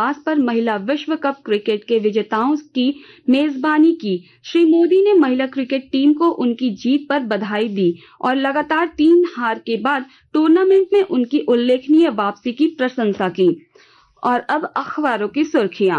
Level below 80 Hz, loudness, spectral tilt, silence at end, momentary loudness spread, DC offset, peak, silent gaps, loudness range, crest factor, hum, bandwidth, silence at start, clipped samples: -64 dBFS; -17 LUFS; -6.5 dB/octave; 0 s; 8 LU; under 0.1%; -6 dBFS; none; 3 LU; 12 dB; none; 6.4 kHz; 0 s; under 0.1%